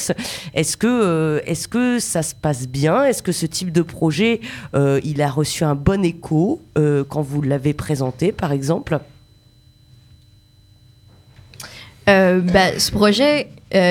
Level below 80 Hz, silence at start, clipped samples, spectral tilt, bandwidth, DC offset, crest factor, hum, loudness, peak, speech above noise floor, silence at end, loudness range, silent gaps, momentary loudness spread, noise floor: -44 dBFS; 0 s; under 0.1%; -5 dB/octave; 19 kHz; under 0.1%; 18 dB; none; -18 LUFS; 0 dBFS; 33 dB; 0 s; 7 LU; none; 8 LU; -51 dBFS